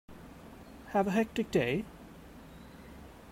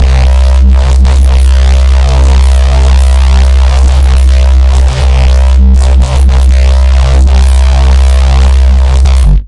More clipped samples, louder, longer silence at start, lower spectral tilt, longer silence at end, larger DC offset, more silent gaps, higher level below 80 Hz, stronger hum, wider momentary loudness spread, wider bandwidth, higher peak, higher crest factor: second, under 0.1% vs 0.1%; second, -32 LUFS vs -7 LUFS; about the same, 0.1 s vs 0 s; about the same, -6.5 dB/octave vs -6 dB/octave; about the same, 0 s vs 0 s; second, under 0.1% vs 1%; neither; second, -58 dBFS vs -4 dBFS; neither; first, 21 LU vs 1 LU; first, 16 kHz vs 11 kHz; second, -16 dBFS vs 0 dBFS; first, 20 dB vs 4 dB